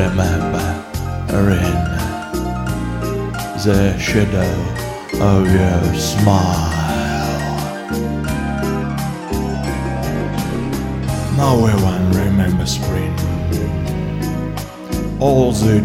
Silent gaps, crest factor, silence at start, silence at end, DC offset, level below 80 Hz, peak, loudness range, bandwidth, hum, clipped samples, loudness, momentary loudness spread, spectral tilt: none; 16 dB; 0 s; 0 s; under 0.1%; -28 dBFS; -2 dBFS; 5 LU; 16.5 kHz; none; under 0.1%; -18 LUFS; 9 LU; -6 dB/octave